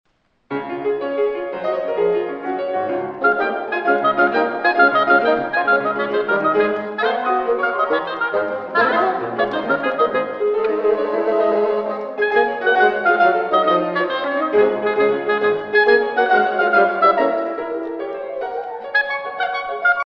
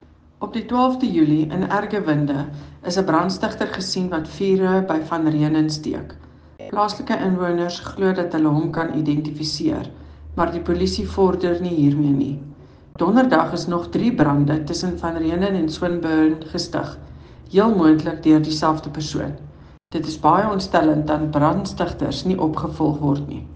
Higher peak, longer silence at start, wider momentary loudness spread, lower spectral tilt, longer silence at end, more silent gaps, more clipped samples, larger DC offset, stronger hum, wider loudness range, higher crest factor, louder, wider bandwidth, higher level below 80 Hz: about the same, -2 dBFS vs -2 dBFS; about the same, 0.5 s vs 0.4 s; about the same, 9 LU vs 10 LU; about the same, -6.5 dB/octave vs -6.5 dB/octave; about the same, 0 s vs 0 s; neither; neither; neither; neither; about the same, 3 LU vs 3 LU; about the same, 16 dB vs 18 dB; about the same, -18 LUFS vs -20 LUFS; second, 6 kHz vs 9.2 kHz; second, -60 dBFS vs -44 dBFS